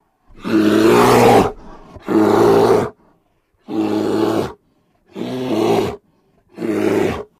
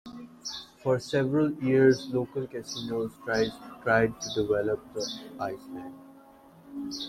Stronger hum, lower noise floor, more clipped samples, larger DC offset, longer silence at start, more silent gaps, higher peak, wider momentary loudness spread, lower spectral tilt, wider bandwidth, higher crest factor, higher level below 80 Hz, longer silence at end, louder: neither; first, -61 dBFS vs -54 dBFS; neither; neither; first, 0.4 s vs 0.05 s; neither; first, 0 dBFS vs -10 dBFS; about the same, 16 LU vs 17 LU; about the same, -6 dB/octave vs -5.5 dB/octave; about the same, 15.5 kHz vs 14.5 kHz; about the same, 16 dB vs 20 dB; first, -44 dBFS vs -60 dBFS; first, 0.15 s vs 0 s; first, -15 LUFS vs -28 LUFS